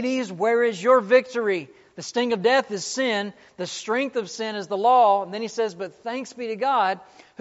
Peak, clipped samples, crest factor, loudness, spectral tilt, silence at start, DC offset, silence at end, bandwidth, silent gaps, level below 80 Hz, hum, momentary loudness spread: -6 dBFS; under 0.1%; 18 dB; -23 LUFS; -2 dB/octave; 0 s; under 0.1%; 0.4 s; 8 kHz; none; -76 dBFS; none; 14 LU